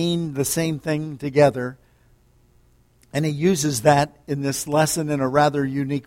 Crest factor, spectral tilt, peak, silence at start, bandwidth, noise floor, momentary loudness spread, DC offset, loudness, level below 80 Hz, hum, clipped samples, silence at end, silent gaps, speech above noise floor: 20 dB; -5 dB/octave; -2 dBFS; 0 s; 16.5 kHz; -57 dBFS; 8 LU; under 0.1%; -21 LUFS; -54 dBFS; none; under 0.1%; 0.05 s; none; 36 dB